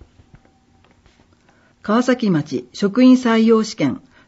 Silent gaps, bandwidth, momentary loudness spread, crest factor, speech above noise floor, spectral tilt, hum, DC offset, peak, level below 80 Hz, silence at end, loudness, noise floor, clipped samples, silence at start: none; 8 kHz; 10 LU; 16 dB; 40 dB; -5.5 dB/octave; none; under 0.1%; -2 dBFS; -58 dBFS; 0.3 s; -16 LUFS; -55 dBFS; under 0.1%; 1.85 s